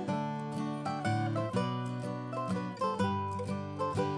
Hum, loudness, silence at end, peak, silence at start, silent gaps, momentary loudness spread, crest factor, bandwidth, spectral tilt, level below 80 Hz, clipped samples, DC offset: none; -35 LUFS; 0 s; -18 dBFS; 0 s; none; 5 LU; 16 dB; 11 kHz; -7 dB/octave; -68 dBFS; under 0.1%; under 0.1%